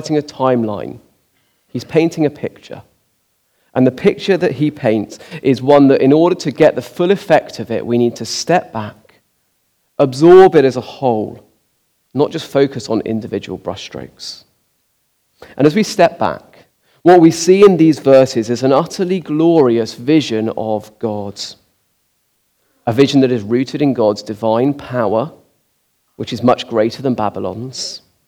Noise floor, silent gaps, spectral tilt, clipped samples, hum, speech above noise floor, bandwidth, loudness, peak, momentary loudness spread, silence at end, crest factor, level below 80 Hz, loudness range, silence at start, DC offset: -63 dBFS; none; -6 dB/octave; 0.3%; none; 50 dB; 14.5 kHz; -14 LUFS; 0 dBFS; 18 LU; 0.3 s; 14 dB; -56 dBFS; 9 LU; 0 s; under 0.1%